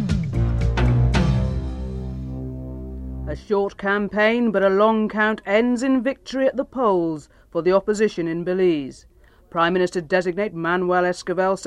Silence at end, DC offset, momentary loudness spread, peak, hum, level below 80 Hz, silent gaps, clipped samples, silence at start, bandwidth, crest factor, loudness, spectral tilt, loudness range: 0 s; under 0.1%; 13 LU; -6 dBFS; none; -32 dBFS; none; under 0.1%; 0 s; 11 kHz; 16 dB; -21 LUFS; -7 dB/octave; 4 LU